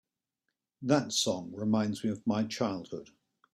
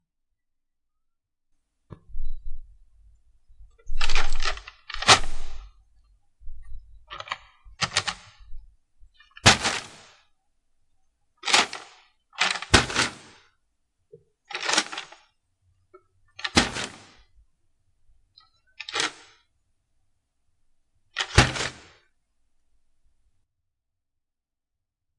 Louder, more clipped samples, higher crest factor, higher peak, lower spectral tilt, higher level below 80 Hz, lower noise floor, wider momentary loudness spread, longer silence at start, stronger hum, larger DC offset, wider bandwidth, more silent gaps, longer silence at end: second, -31 LUFS vs -23 LUFS; neither; about the same, 22 dB vs 26 dB; second, -12 dBFS vs 0 dBFS; first, -4.5 dB/octave vs -2 dB/octave; second, -70 dBFS vs -36 dBFS; about the same, -86 dBFS vs -84 dBFS; second, 12 LU vs 24 LU; second, 0.8 s vs 2.15 s; neither; neither; first, 14 kHz vs 11.5 kHz; neither; second, 0.5 s vs 3.45 s